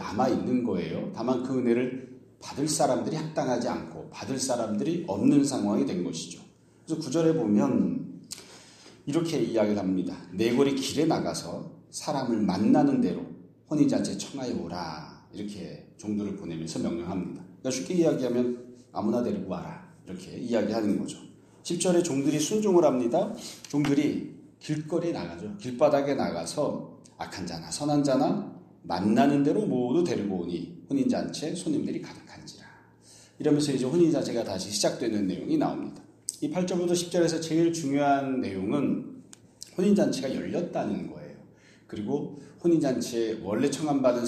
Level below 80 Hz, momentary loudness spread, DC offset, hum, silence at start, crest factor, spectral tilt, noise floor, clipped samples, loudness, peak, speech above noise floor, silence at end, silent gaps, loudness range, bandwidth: -64 dBFS; 16 LU; under 0.1%; none; 0 s; 18 dB; -5.5 dB/octave; -55 dBFS; under 0.1%; -28 LUFS; -10 dBFS; 28 dB; 0 s; none; 4 LU; 13.5 kHz